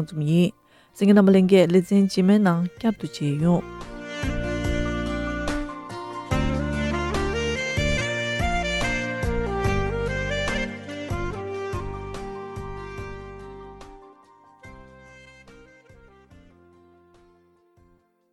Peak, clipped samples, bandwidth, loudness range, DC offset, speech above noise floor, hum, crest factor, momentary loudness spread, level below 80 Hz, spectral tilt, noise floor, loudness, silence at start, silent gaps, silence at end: -4 dBFS; under 0.1%; 12.5 kHz; 19 LU; under 0.1%; 42 dB; none; 20 dB; 17 LU; -36 dBFS; -6.5 dB/octave; -61 dBFS; -24 LUFS; 0 s; none; 2.7 s